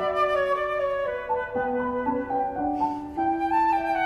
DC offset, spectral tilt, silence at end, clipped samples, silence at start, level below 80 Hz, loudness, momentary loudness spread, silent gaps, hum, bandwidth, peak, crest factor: under 0.1%; -6 dB/octave; 0 s; under 0.1%; 0 s; -52 dBFS; -26 LUFS; 5 LU; none; none; 12.5 kHz; -12 dBFS; 12 dB